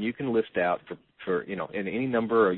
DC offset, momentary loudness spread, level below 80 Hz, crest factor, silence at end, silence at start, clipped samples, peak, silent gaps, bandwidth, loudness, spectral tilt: under 0.1%; 8 LU; -64 dBFS; 16 dB; 0 s; 0 s; under 0.1%; -12 dBFS; none; 4.2 kHz; -28 LUFS; -10.5 dB/octave